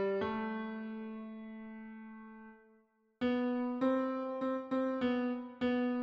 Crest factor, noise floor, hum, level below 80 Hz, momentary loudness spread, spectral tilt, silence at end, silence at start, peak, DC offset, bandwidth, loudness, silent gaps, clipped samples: 16 dB; -70 dBFS; none; -72 dBFS; 17 LU; -7.5 dB/octave; 0 s; 0 s; -22 dBFS; under 0.1%; 5.8 kHz; -36 LUFS; none; under 0.1%